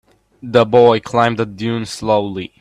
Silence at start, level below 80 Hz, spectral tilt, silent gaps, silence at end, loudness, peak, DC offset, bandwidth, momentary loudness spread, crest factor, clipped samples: 0.45 s; -50 dBFS; -6 dB/octave; none; 0.15 s; -15 LUFS; 0 dBFS; under 0.1%; 11.5 kHz; 11 LU; 16 dB; under 0.1%